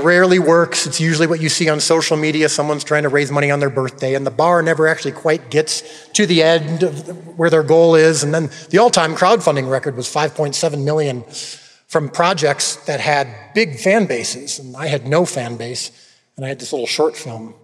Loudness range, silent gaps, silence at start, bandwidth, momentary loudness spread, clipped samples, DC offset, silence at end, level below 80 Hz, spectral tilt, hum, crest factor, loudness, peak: 5 LU; none; 0 s; 13 kHz; 12 LU; under 0.1%; under 0.1%; 0.1 s; -68 dBFS; -4 dB/octave; none; 16 dB; -16 LUFS; 0 dBFS